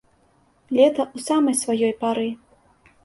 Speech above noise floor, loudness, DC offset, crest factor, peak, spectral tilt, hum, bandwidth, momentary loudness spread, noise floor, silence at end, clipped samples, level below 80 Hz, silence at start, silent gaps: 40 dB; -21 LUFS; under 0.1%; 18 dB; -4 dBFS; -3.5 dB/octave; none; 12 kHz; 9 LU; -60 dBFS; 0.7 s; under 0.1%; -66 dBFS; 0.7 s; none